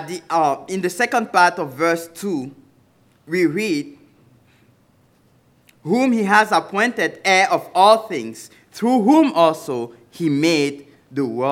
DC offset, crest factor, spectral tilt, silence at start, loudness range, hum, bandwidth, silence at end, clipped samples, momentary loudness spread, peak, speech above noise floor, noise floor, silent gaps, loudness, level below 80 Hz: under 0.1%; 18 dB; -4.5 dB/octave; 0 s; 9 LU; none; 16.5 kHz; 0 s; under 0.1%; 14 LU; 0 dBFS; 39 dB; -57 dBFS; none; -18 LUFS; -72 dBFS